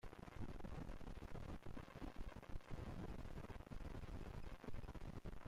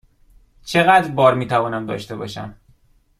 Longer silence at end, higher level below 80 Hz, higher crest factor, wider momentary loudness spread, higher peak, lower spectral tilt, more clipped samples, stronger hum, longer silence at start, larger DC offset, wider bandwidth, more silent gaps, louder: second, 0 s vs 0.65 s; about the same, -54 dBFS vs -52 dBFS; second, 12 dB vs 18 dB; second, 3 LU vs 19 LU; second, -38 dBFS vs -2 dBFS; first, -7 dB/octave vs -5.5 dB/octave; neither; neither; second, 0.05 s vs 0.65 s; neither; about the same, 15 kHz vs 15 kHz; neither; second, -55 LUFS vs -18 LUFS